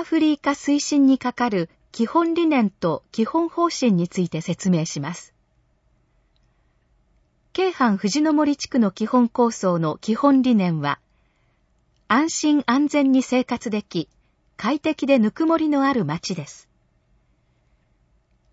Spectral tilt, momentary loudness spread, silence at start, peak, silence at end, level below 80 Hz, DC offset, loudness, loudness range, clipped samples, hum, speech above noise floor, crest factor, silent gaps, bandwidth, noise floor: -5.5 dB/octave; 9 LU; 0 s; -4 dBFS; 2 s; -62 dBFS; under 0.1%; -21 LUFS; 6 LU; under 0.1%; none; 44 dB; 18 dB; none; 8 kHz; -64 dBFS